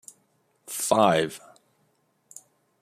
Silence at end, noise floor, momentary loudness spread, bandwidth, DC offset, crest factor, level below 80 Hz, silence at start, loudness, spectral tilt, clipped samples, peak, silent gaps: 1.45 s; -69 dBFS; 27 LU; 15.5 kHz; under 0.1%; 24 dB; -70 dBFS; 0.7 s; -24 LUFS; -3.5 dB/octave; under 0.1%; -6 dBFS; none